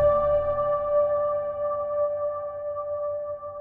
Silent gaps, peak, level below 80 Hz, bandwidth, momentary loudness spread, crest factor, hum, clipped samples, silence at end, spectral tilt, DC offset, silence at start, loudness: none; -12 dBFS; -48 dBFS; 3.5 kHz; 9 LU; 14 dB; none; under 0.1%; 0 s; -9.5 dB/octave; under 0.1%; 0 s; -26 LUFS